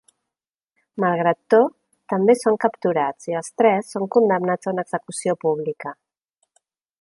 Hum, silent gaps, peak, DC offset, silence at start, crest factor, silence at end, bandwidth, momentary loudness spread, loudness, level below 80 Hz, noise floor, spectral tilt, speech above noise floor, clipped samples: none; none; -4 dBFS; under 0.1%; 0.95 s; 18 dB; 1.1 s; 11.5 kHz; 10 LU; -21 LUFS; -72 dBFS; -88 dBFS; -6 dB/octave; 69 dB; under 0.1%